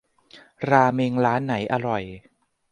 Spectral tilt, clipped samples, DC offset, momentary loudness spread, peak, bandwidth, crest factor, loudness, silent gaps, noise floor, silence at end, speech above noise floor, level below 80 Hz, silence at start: -7.5 dB/octave; under 0.1%; under 0.1%; 12 LU; -2 dBFS; 9.6 kHz; 22 dB; -22 LUFS; none; -52 dBFS; 0.5 s; 30 dB; -58 dBFS; 0.35 s